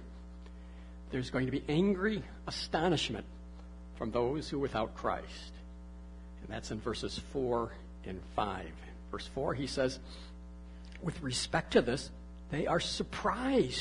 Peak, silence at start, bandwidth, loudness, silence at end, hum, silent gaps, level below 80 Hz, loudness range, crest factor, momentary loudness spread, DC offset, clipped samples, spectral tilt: -14 dBFS; 0 s; 11 kHz; -35 LUFS; 0 s; none; none; -50 dBFS; 5 LU; 22 dB; 20 LU; under 0.1%; under 0.1%; -5 dB/octave